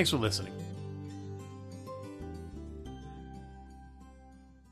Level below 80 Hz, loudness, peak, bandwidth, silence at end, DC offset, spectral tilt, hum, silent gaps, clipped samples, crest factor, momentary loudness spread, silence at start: -54 dBFS; -39 LUFS; -14 dBFS; 13 kHz; 0 s; under 0.1%; -4.5 dB/octave; none; none; under 0.1%; 24 dB; 21 LU; 0 s